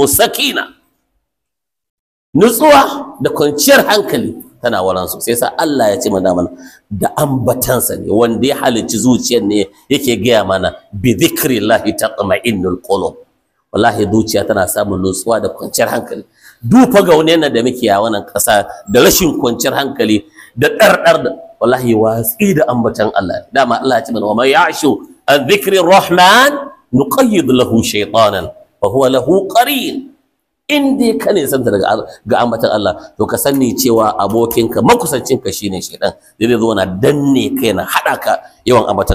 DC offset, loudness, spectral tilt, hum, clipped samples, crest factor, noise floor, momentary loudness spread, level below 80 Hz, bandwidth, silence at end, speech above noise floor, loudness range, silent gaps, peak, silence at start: under 0.1%; -12 LUFS; -4 dB/octave; none; under 0.1%; 12 dB; -80 dBFS; 10 LU; -42 dBFS; 16 kHz; 0 s; 68 dB; 4 LU; 1.90-2.33 s; 0 dBFS; 0 s